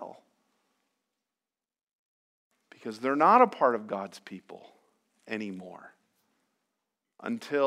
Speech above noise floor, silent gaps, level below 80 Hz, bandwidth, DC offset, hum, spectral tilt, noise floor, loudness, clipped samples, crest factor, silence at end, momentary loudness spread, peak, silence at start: over 62 dB; 1.83-1.87 s, 1.93-2.51 s; under -90 dBFS; 13 kHz; under 0.1%; none; -6 dB/octave; under -90 dBFS; -26 LUFS; under 0.1%; 24 dB; 0 s; 25 LU; -6 dBFS; 0 s